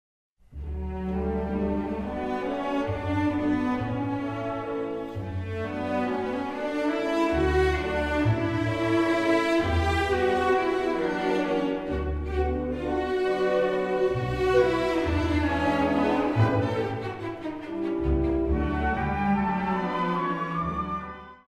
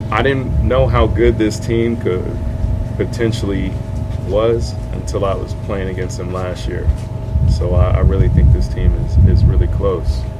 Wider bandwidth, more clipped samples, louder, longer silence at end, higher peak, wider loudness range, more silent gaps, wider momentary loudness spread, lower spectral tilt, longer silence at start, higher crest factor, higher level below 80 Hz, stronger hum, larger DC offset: first, 13 kHz vs 11.5 kHz; neither; second, -27 LUFS vs -16 LUFS; first, 0.15 s vs 0 s; second, -10 dBFS vs 0 dBFS; about the same, 5 LU vs 5 LU; neither; about the same, 9 LU vs 9 LU; about the same, -7 dB/octave vs -7.5 dB/octave; first, 0.5 s vs 0 s; about the same, 16 dB vs 14 dB; second, -38 dBFS vs -18 dBFS; neither; neither